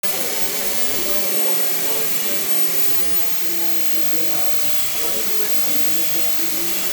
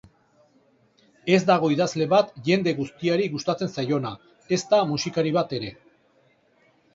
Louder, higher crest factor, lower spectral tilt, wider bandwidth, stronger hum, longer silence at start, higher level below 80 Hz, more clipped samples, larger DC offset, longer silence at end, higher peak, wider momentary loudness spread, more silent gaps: first, -14 LUFS vs -23 LUFS; second, 10 dB vs 20 dB; second, -1 dB/octave vs -5.5 dB/octave; first, over 20 kHz vs 7.8 kHz; neither; second, 0.05 s vs 1.25 s; about the same, -68 dBFS vs -64 dBFS; neither; neither; second, 0 s vs 1.2 s; about the same, -6 dBFS vs -4 dBFS; second, 3 LU vs 10 LU; neither